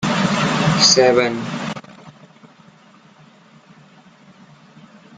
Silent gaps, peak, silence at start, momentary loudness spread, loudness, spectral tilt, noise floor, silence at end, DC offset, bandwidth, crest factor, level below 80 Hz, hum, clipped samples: none; 0 dBFS; 0 s; 17 LU; -15 LUFS; -3.5 dB/octave; -48 dBFS; 3.05 s; under 0.1%; 9.6 kHz; 20 dB; -54 dBFS; none; under 0.1%